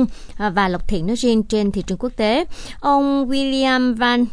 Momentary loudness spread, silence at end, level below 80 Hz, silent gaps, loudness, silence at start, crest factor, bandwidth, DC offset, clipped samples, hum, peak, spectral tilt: 7 LU; 0 s; -34 dBFS; none; -19 LUFS; 0 s; 14 dB; 11 kHz; under 0.1%; under 0.1%; none; -4 dBFS; -5 dB/octave